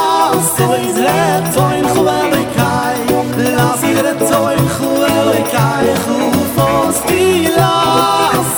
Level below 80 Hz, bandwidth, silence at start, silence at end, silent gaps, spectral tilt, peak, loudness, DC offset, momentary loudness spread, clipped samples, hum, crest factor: -40 dBFS; over 20 kHz; 0 s; 0 s; none; -4.5 dB/octave; -2 dBFS; -12 LUFS; under 0.1%; 3 LU; under 0.1%; none; 10 dB